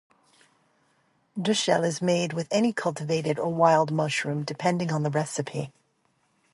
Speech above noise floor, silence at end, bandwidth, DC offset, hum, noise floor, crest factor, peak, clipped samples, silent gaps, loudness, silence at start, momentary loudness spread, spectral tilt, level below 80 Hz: 44 dB; 0.85 s; 11.5 kHz; under 0.1%; none; -70 dBFS; 22 dB; -6 dBFS; under 0.1%; none; -26 LUFS; 1.35 s; 10 LU; -5 dB/octave; -70 dBFS